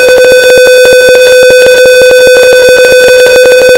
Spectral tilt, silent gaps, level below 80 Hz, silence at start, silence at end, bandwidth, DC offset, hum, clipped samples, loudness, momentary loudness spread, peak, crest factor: -1 dB/octave; none; -34 dBFS; 0 s; 0 s; 16.5 kHz; 0.5%; none; 30%; -1 LUFS; 0 LU; 0 dBFS; 2 dB